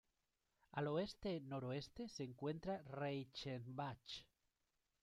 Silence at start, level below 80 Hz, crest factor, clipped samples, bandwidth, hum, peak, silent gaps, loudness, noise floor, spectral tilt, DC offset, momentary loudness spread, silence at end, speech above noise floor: 0.75 s; -72 dBFS; 18 dB; under 0.1%; 13 kHz; none; -30 dBFS; none; -48 LUFS; -88 dBFS; -6.5 dB/octave; under 0.1%; 8 LU; 0.8 s; 41 dB